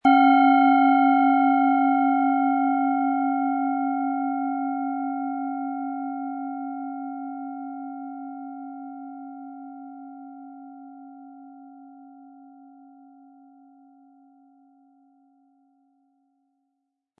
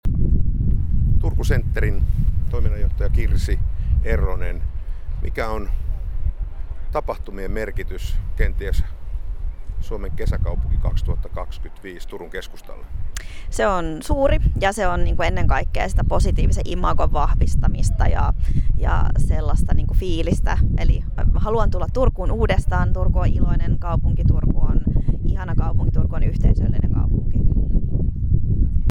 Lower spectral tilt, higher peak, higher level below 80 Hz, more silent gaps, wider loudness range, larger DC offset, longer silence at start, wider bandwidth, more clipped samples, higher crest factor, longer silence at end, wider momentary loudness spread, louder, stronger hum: about the same, -6.5 dB/octave vs -7 dB/octave; about the same, -6 dBFS vs -4 dBFS; second, -78 dBFS vs -20 dBFS; neither; first, 24 LU vs 7 LU; neither; about the same, 0.05 s vs 0.05 s; second, 4.4 kHz vs 11 kHz; neither; about the same, 18 dB vs 14 dB; first, 4.95 s vs 0 s; first, 25 LU vs 12 LU; about the same, -22 LUFS vs -23 LUFS; neither